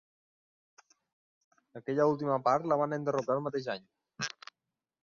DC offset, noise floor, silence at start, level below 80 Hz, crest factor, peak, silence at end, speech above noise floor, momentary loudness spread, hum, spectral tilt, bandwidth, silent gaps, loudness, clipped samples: under 0.1%; -89 dBFS; 1.75 s; -78 dBFS; 20 dB; -14 dBFS; 0.75 s; 59 dB; 16 LU; none; -5.5 dB/octave; 7.2 kHz; none; -32 LUFS; under 0.1%